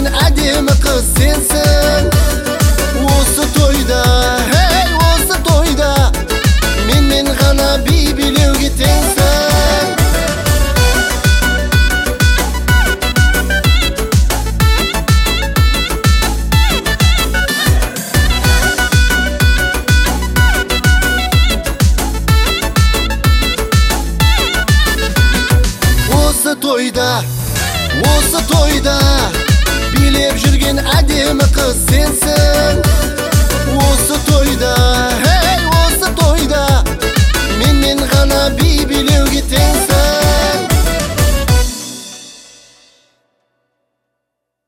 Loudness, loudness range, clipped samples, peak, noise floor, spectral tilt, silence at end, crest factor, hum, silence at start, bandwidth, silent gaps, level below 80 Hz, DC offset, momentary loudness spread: -12 LUFS; 1 LU; under 0.1%; 0 dBFS; -75 dBFS; -4 dB/octave; 2.3 s; 10 dB; none; 0 s; 16.5 kHz; none; -14 dBFS; under 0.1%; 3 LU